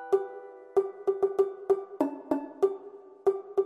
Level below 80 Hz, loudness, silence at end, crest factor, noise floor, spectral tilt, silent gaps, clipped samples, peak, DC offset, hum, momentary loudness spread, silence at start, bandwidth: -76 dBFS; -30 LUFS; 0 s; 18 dB; -48 dBFS; -7 dB/octave; none; under 0.1%; -12 dBFS; under 0.1%; none; 12 LU; 0 s; 7.8 kHz